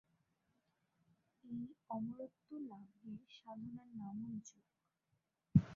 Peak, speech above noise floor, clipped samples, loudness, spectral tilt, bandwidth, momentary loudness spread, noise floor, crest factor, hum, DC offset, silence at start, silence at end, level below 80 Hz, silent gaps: -18 dBFS; 36 dB; under 0.1%; -46 LUFS; -9.5 dB/octave; 7.2 kHz; 12 LU; -85 dBFS; 28 dB; none; under 0.1%; 1.45 s; 0 s; -66 dBFS; none